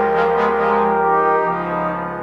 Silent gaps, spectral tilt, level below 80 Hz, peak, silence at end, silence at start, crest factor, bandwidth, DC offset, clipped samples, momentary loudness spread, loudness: none; -7.5 dB/octave; -46 dBFS; -4 dBFS; 0 s; 0 s; 12 dB; 6.4 kHz; under 0.1%; under 0.1%; 6 LU; -17 LUFS